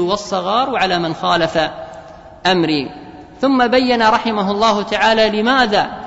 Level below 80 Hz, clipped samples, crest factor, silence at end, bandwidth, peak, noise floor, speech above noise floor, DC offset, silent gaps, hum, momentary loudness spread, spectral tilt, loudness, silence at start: -46 dBFS; under 0.1%; 14 dB; 0 s; 8 kHz; -2 dBFS; -36 dBFS; 21 dB; under 0.1%; none; none; 8 LU; -4.5 dB/octave; -15 LUFS; 0 s